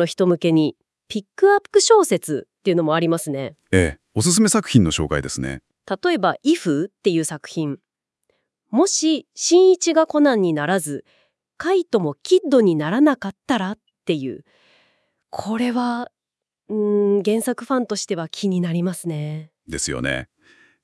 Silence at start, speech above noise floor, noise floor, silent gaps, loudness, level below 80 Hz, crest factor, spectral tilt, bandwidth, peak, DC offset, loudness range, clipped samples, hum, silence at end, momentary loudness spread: 0 s; 68 dB; -87 dBFS; none; -20 LUFS; -50 dBFS; 20 dB; -4.5 dB/octave; 12 kHz; 0 dBFS; under 0.1%; 5 LU; under 0.1%; none; 0.6 s; 14 LU